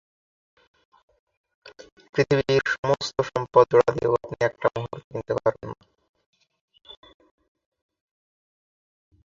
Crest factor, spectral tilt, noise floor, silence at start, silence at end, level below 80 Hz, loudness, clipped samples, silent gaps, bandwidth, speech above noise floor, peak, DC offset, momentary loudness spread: 24 dB; -5.5 dB/octave; under -90 dBFS; 1.65 s; 2.35 s; -58 dBFS; -23 LUFS; under 0.1%; 1.92-1.97 s, 2.09-2.13 s, 2.78-2.83 s, 5.04-5.11 s, 6.09-6.14 s, 6.26-6.33 s, 6.61-6.68 s; 7.6 kHz; over 68 dB; -2 dBFS; under 0.1%; 15 LU